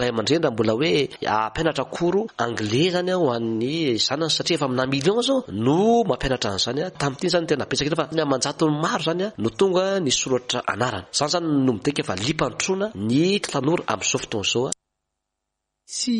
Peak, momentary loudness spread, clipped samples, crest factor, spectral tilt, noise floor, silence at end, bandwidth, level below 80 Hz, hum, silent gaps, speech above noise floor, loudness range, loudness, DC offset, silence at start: -6 dBFS; 5 LU; under 0.1%; 16 dB; -4 dB/octave; -81 dBFS; 0 s; 11.5 kHz; -50 dBFS; none; none; 59 dB; 2 LU; -22 LUFS; under 0.1%; 0 s